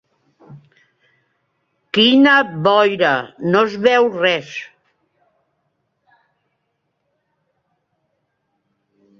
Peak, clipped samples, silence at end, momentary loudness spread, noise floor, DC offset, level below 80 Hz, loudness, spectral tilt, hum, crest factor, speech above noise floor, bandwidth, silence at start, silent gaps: -2 dBFS; under 0.1%; 4.55 s; 11 LU; -71 dBFS; under 0.1%; -66 dBFS; -14 LUFS; -5.5 dB/octave; none; 18 dB; 57 dB; 7.2 kHz; 0.5 s; none